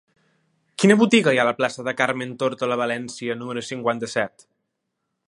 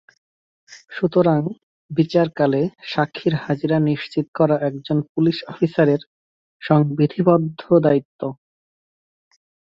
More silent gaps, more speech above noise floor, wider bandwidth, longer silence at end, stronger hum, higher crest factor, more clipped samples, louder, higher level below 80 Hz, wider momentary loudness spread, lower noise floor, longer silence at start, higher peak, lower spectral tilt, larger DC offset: second, none vs 1.63-1.89 s, 4.28-4.33 s, 5.09-5.15 s, 6.06-6.60 s, 8.05-8.19 s; second, 57 dB vs over 71 dB; first, 11.5 kHz vs 7.4 kHz; second, 1 s vs 1.4 s; neither; about the same, 22 dB vs 18 dB; neither; about the same, -21 LUFS vs -20 LUFS; second, -70 dBFS vs -60 dBFS; first, 13 LU vs 10 LU; second, -78 dBFS vs under -90 dBFS; about the same, 0.8 s vs 0.7 s; about the same, 0 dBFS vs -2 dBFS; second, -5 dB/octave vs -8.5 dB/octave; neither